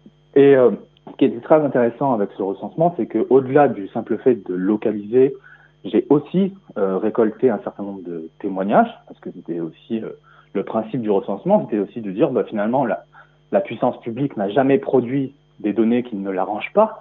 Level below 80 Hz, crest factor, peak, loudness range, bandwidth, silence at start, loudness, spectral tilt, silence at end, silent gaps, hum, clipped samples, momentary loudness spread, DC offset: -66 dBFS; 20 dB; 0 dBFS; 5 LU; 4 kHz; 0.35 s; -20 LUFS; -7 dB/octave; 0 s; none; none; under 0.1%; 13 LU; under 0.1%